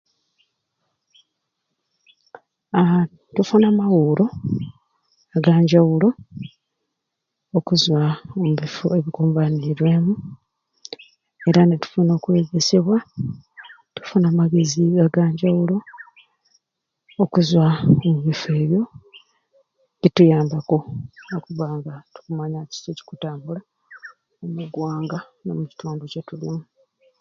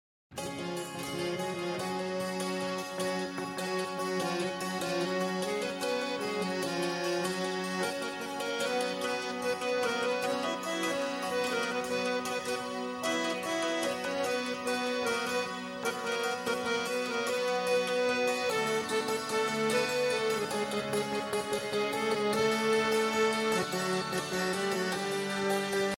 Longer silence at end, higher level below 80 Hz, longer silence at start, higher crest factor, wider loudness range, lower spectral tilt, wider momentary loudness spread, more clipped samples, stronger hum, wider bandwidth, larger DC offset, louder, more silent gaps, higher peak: first, 0.6 s vs 0 s; first, -58 dBFS vs -70 dBFS; first, 2.75 s vs 0.3 s; about the same, 20 dB vs 16 dB; first, 11 LU vs 4 LU; first, -7 dB/octave vs -3.5 dB/octave; first, 18 LU vs 6 LU; neither; neither; second, 7.2 kHz vs 16.5 kHz; neither; first, -19 LUFS vs -32 LUFS; neither; first, 0 dBFS vs -16 dBFS